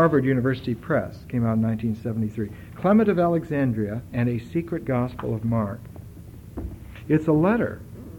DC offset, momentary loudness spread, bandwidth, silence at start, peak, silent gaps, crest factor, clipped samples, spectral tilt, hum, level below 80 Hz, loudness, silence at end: under 0.1%; 18 LU; 17 kHz; 0 s; -6 dBFS; none; 18 dB; under 0.1%; -9.5 dB/octave; none; -46 dBFS; -24 LUFS; 0 s